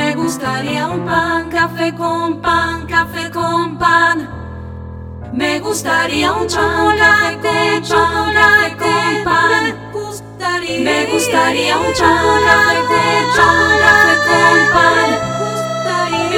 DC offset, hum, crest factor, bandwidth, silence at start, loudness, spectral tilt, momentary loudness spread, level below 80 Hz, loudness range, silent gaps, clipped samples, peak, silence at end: under 0.1%; none; 14 dB; 18.5 kHz; 0 s; -13 LUFS; -3.5 dB/octave; 11 LU; -38 dBFS; 6 LU; none; under 0.1%; 0 dBFS; 0 s